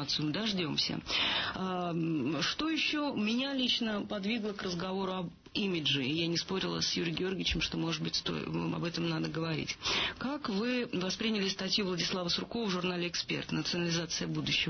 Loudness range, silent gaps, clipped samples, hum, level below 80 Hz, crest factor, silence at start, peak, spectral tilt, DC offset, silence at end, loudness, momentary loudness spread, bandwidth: 2 LU; none; under 0.1%; none; -56 dBFS; 14 dB; 0 s; -18 dBFS; -4 dB/octave; under 0.1%; 0 s; -33 LUFS; 5 LU; 6.6 kHz